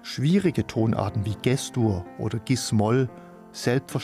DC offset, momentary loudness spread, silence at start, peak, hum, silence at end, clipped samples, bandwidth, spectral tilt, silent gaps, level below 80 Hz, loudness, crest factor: under 0.1%; 8 LU; 0.05 s; -8 dBFS; none; 0 s; under 0.1%; 15.5 kHz; -6 dB/octave; none; -54 dBFS; -25 LUFS; 16 dB